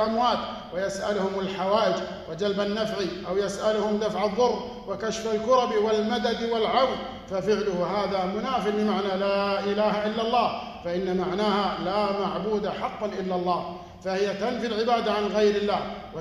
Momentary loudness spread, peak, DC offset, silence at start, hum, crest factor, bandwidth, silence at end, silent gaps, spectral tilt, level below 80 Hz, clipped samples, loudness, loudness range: 8 LU; -8 dBFS; under 0.1%; 0 s; none; 16 dB; 12 kHz; 0 s; none; -5 dB/octave; -54 dBFS; under 0.1%; -26 LUFS; 2 LU